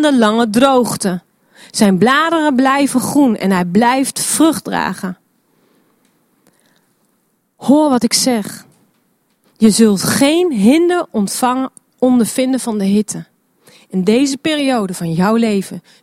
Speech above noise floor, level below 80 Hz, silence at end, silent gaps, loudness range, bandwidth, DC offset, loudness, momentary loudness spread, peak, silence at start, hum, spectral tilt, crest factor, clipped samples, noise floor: 49 dB; -54 dBFS; 0.25 s; none; 5 LU; 16 kHz; under 0.1%; -14 LUFS; 9 LU; 0 dBFS; 0 s; none; -4.5 dB/octave; 14 dB; under 0.1%; -62 dBFS